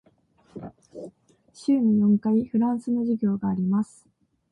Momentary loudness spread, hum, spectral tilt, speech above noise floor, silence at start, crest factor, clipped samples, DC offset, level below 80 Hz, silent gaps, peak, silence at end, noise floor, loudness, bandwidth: 22 LU; none; -9 dB/octave; 39 dB; 0.55 s; 12 dB; under 0.1%; under 0.1%; -64 dBFS; none; -12 dBFS; 0.65 s; -61 dBFS; -24 LUFS; 10 kHz